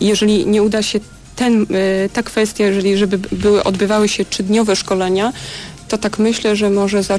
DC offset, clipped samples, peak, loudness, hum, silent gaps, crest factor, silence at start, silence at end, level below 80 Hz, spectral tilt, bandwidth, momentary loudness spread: under 0.1%; under 0.1%; -4 dBFS; -15 LUFS; none; none; 12 dB; 0 s; 0 s; -42 dBFS; -4.5 dB/octave; 11 kHz; 7 LU